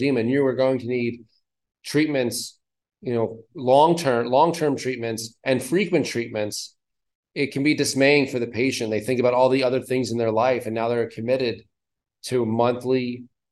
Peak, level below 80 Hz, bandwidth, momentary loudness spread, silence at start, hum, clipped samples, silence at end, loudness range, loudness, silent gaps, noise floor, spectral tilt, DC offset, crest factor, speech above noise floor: -4 dBFS; -68 dBFS; 12.5 kHz; 11 LU; 0 s; none; under 0.1%; 0.25 s; 4 LU; -22 LUFS; 7.15-7.23 s; -85 dBFS; -5 dB/octave; under 0.1%; 18 dB; 63 dB